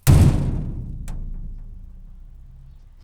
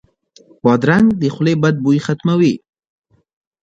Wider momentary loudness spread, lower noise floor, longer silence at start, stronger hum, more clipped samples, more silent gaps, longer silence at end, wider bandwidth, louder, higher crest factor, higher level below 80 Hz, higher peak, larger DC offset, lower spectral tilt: first, 27 LU vs 5 LU; second, -43 dBFS vs -49 dBFS; second, 0.05 s vs 0.65 s; neither; neither; neither; second, 0.25 s vs 1.05 s; first, over 20 kHz vs 8.2 kHz; second, -21 LUFS vs -15 LUFS; about the same, 18 dB vs 16 dB; first, -26 dBFS vs -52 dBFS; about the same, -2 dBFS vs 0 dBFS; neither; about the same, -7 dB/octave vs -7.5 dB/octave